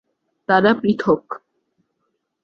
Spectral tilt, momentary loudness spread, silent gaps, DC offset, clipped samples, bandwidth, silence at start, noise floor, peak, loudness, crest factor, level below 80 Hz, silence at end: -7.5 dB/octave; 19 LU; none; under 0.1%; under 0.1%; 6.6 kHz; 0.5 s; -73 dBFS; -2 dBFS; -18 LUFS; 20 dB; -60 dBFS; 1.05 s